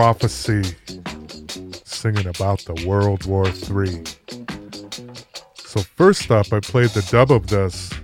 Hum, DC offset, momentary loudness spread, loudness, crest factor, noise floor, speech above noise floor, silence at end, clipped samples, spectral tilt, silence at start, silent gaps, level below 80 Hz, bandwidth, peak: none; under 0.1%; 18 LU; -19 LUFS; 20 dB; -40 dBFS; 22 dB; 0 s; under 0.1%; -6 dB/octave; 0 s; none; -40 dBFS; 15.5 kHz; 0 dBFS